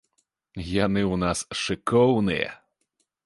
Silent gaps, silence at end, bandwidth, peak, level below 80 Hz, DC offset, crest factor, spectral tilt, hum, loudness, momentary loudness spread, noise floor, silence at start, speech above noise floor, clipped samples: none; 0.7 s; 11.5 kHz; -6 dBFS; -48 dBFS; under 0.1%; 18 dB; -5.5 dB/octave; none; -24 LUFS; 12 LU; -75 dBFS; 0.55 s; 51 dB; under 0.1%